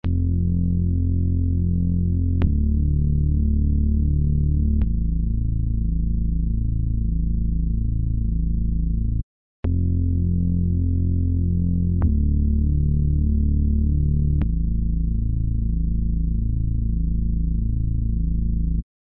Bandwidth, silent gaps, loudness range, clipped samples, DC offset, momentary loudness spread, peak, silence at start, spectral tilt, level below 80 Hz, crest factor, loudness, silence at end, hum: 2.6 kHz; 9.23-9.63 s; 3 LU; under 0.1%; under 0.1%; 3 LU; -8 dBFS; 0.05 s; -14 dB/octave; -22 dBFS; 12 dB; -23 LUFS; 0.35 s; none